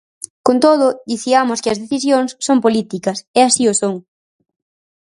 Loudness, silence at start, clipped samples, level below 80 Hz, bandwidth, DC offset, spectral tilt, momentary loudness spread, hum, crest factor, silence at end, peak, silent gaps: -15 LUFS; 0.45 s; under 0.1%; -60 dBFS; 11.5 kHz; under 0.1%; -3.5 dB/octave; 10 LU; none; 16 dB; 1.05 s; 0 dBFS; 3.27-3.34 s